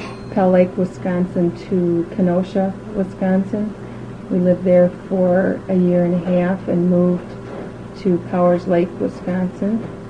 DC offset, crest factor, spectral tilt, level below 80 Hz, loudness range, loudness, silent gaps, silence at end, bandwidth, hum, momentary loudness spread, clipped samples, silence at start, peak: 0.2%; 16 dB; -9.5 dB/octave; -46 dBFS; 3 LU; -18 LUFS; none; 0 s; 7.4 kHz; none; 10 LU; under 0.1%; 0 s; -2 dBFS